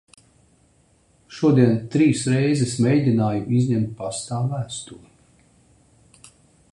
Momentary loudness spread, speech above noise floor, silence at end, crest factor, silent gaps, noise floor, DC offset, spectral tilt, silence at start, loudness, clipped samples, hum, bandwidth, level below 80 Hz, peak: 12 LU; 39 dB; 1.75 s; 20 dB; none; -59 dBFS; under 0.1%; -6.5 dB/octave; 1.3 s; -21 LUFS; under 0.1%; none; 11 kHz; -56 dBFS; -4 dBFS